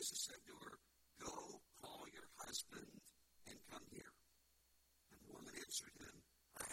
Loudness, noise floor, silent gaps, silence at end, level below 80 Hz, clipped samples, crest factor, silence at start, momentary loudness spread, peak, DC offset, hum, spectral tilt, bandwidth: -53 LUFS; -78 dBFS; none; 0 s; -78 dBFS; under 0.1%; 22 dB; 0 s; 18 LU; -34 dBFS; under 0.1%; none; -1 dB/octave; 16.5 kHz